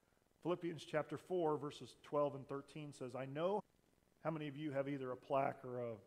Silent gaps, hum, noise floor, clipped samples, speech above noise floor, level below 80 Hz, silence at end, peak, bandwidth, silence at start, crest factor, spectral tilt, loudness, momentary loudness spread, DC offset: none; none; -76 dBFS; under 0.1%; 33 dB; -82 dBFS; 0 s; -24 dBFS; 14.5 kHz; 0.45 s; 18 dB; -7 dB/octave; -44 LUFS; 9 LU; under 0.1%